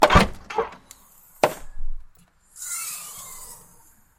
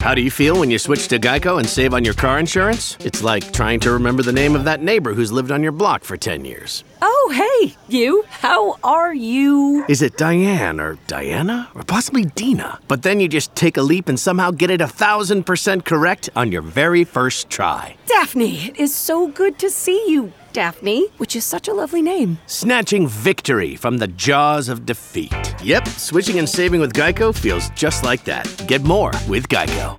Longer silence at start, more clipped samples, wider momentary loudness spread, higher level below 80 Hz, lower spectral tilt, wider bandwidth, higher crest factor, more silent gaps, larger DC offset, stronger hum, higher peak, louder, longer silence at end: about the same, 0 s vs 0 s; neither; first, 23 LU vs 6 LU; about the same, -34 dBFS vs -36 dBFS; about the same, -4 dB/octave vs -4.5 dB/octave; about the same, 16.5 kHz vs 17.5 kHz; first, 24 dB vs 16 dB; neither; neither; neither; about the same, 0 dBFS vs -2 dBFS; second, -25 LUFS vs -17 LUFS; first, 0.65 s vs 0 s